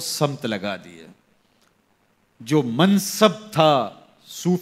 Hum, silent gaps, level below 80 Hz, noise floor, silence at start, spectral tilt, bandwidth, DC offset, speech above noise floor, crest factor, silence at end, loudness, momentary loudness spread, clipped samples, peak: none; none; -68 dBFS; -64 dBFS; 0 s; -5 dB/octave; 16 kHz; under 0.1%; 43 dB; 22 dB; 0 s; -21 LUFS; 15 LU; under 0.1%; -2 dBFS